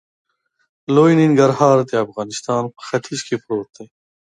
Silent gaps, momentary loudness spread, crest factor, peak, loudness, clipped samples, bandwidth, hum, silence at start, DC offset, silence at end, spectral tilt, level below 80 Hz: none; 13 LU; 18 dB; 0 dBFS; -17 LUFS; under 0.1%; 11 kHz; none; 0.9 s; under 0.1%; 0.35 s; -6 dB/octave; -64 dBFS